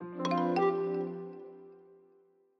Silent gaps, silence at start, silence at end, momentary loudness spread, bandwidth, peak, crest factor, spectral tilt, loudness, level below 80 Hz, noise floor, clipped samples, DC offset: none; 0 s; 0.65 s; 21 LU; 6.6 kHz; -18 dBFS; 18 dB; -7 dB/octave; -32 LUFS; -84 dBFS; -66 dBFS; under 0.1%; under 0.1%